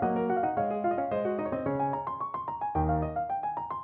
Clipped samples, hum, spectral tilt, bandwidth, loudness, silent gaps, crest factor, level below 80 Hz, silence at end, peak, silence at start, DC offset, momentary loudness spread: under 0.1%; none; -11.5 dB/octave; 4 kHz; -31 LUFS; none; 14 dB; -46 dBFS; 0 s; -16 dBFS; 0 s; under 0.1%; 6 LU